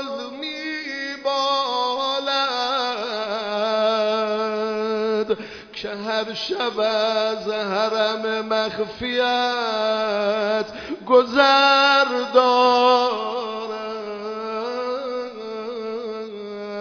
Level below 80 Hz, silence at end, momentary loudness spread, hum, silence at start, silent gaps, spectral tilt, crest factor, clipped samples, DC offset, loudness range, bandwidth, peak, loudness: -62 dBFS; 0 s; 14 LU; none; 0 s; none; -3.5 dB/octave; 20 dB; under 0.1%; under 0.1%; 6 LU; 5.4 kHz; -2 dBFS; -21 LUFS